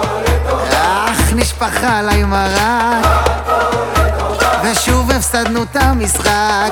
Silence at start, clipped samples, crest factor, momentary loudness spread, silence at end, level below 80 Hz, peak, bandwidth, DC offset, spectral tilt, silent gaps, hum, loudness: 0 s; under 0.1%; 12 dB; 3 LU; 0 s; -20 dBFS; 0 dBFS; 18.5 kHz; under 0.1%; -4 dB/octave; none; none; -13 LUFS